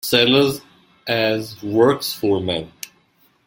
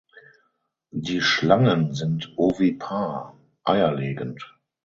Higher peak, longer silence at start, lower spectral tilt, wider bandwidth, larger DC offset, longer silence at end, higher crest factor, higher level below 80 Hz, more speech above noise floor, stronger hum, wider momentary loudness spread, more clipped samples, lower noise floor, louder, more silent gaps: about the same, -2 dBFS vs -2 dBFS; second, 0.05 s vs 0.95 s; second, -4.5 dB/octave vs -6 dB/octave; first, 17 kHz vs 7.6 kHz; neither; first, 0.6 s vs 0.4 s; about the same, 18 dB vs 22 dB; about the same, -56 dBFS vs -56 dBFS; second, 41 dB vs 50 dB; neither; about the same, 19 LU vs 17 LU; neither; second, -59 dBFS vs -72 dBFS; first, -18 LUFS vs -23 LUFS; neither